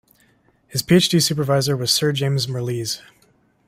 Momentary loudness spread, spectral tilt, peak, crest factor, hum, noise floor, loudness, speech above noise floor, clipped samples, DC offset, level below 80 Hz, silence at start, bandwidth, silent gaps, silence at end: 11 LU; -4.5 dB/octave; -4 dBFS; 18 dB; none; -59 dBFS; -19 LUFS; 40 dB; under 0.1%; under 0.1%; -56 dBFS; 0.7 s; 16 kHz; none; 0.7 s